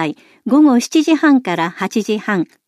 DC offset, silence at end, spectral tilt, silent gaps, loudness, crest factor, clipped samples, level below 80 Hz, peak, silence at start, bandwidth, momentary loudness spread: under 0.1%; 0.25 s; -5 dB/octave; none; -15 LUFS; 12 dB; under 0.1%; -66 dBFS; -4 dBFS; 0 s; 13.5 kHz; 9 LU